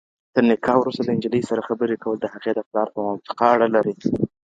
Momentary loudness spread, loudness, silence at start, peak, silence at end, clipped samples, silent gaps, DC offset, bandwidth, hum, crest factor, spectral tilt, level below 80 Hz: 8 LU; -21 LUFS; 0.35 s; -2 dBFS; 0.25 s; under 0.1%; 2.66-2.71 s; under 0.1%; 7.8 kHz; none; 20 dB; -7.5 dB/octave; -58 dBFS